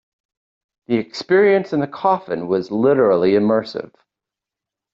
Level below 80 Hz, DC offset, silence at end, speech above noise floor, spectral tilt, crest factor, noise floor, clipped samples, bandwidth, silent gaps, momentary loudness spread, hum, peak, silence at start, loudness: -62 dBFS; under 0.1%; 1.1 s; 69 dB; -7 dB/octave; 14 dB; -86 dBFS; under 0.1%; 7.4 kHz; none; 8 LU; none; -4 dBFS; 0.9 s; -17 LUFS